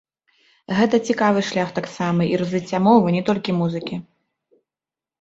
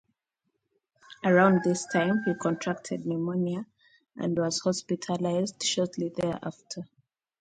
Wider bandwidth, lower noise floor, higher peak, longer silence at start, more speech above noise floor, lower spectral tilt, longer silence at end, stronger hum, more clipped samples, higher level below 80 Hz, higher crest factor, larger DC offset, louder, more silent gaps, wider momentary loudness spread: second, 8 kHz vs 9.4 kHz; first, -90 dBFS vs -81 dBFS; first, -2 dBFS vs -6 dBFS; second, 0.7 s vs 1.1 s; first, 71 dB vs 54 dB; first, -6.5 dB/octave vs -5 dB/octave; first, 1.2 s vs 0.55 s; neither; neither; first, -60 dBFS vs -68 dBFS; about the same, 20 dB vs 22 dB; neither; first, -20 LUFS vs -28 LUFS; neither; second, 10 LU vs 15 LU